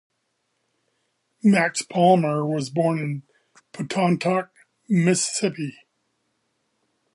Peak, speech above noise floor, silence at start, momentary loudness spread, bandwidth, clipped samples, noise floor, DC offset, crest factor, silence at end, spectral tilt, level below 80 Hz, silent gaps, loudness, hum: -4 dBFS; 53 dB; 1.45 s; 15 LU; 11.5 kHz; under 0.1%; -74 dBFS; under 0.1%; 20 dB; 1.45 s; -5 dB/octave; -72 dBFS; none; -22 LUFS; none